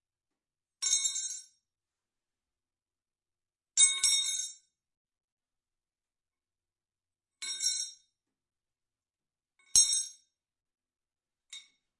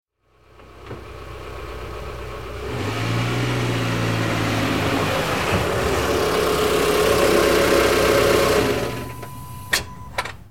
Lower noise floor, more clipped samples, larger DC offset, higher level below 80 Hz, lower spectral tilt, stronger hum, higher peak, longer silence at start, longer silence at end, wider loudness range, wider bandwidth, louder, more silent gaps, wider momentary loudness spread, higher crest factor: first, under -90 dBFS vs -56 dBFS; neither; second, under 0.1% vs 0.8%; second, -72 dBFS vs -38 dBFS; second, 4.5 dB/octave vs -4.5 dB/octave; neither; second, -6 dBFS vs -2 dBFS; first, 0.8 s vs 0.05 s; first, 0.4 s vs 0 s; about the same, 9 LU vs 9 LU; second, 11.5 kHz vs 17 kHz; second, -27 LUFS vs -20 LUFS; first, 4.97-5.05 s, 5.24-5.37 s vs none; about the same, 18 LU vs 18 LU; first, 30 dB vs 20 dB